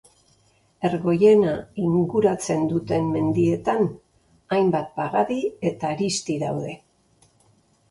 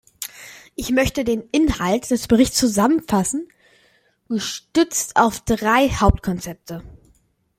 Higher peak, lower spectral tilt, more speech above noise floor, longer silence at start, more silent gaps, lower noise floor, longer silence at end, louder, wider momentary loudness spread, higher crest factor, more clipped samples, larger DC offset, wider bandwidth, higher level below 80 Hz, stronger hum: second, -6 dBFS vs -2 dBFS; first, -6.5 dB/octave vs -4.5 dB/octave; about the same, 40 dB vs 41 dB; first, 0.8 s vs 0.2 s; neither; about the same, -61 dBFS vs -60 dBFS; first, 1.15 s vs 0.65 s; second, -22 LUFS vs -19 LUFS; second, 8 LU vs 16 LU; about the same, 18 dB vs 18 dB; neither; neither; second, 11.5 kHz vs 16.5 kHz; second, -58 dBFS vs -34 dBFS; neither